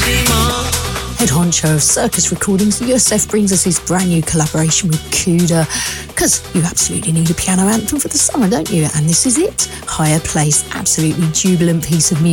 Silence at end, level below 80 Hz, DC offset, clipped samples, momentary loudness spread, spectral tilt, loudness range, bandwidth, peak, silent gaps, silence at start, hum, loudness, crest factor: 0 s; -32 dBFS; under 0.1%; under 0.1%; 4 LU; -4 dB/octave; 1 LU; 18.5 kHz; 0 dBFS; none; 0 s; none; -13 LUFS; 14 dB